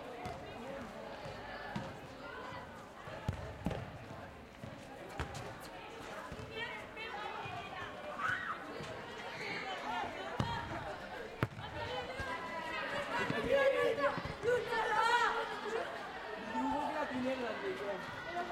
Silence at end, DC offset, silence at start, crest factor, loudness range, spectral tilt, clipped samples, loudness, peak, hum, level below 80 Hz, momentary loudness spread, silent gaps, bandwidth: 0 s; under 0.1%; 0 s; 26 dB; 12 LU; -5 dB/octave; under 0.1%; -39 LUFS; -14 dBFS; none; -60 dBFS; 15 LU; none; 16 kHz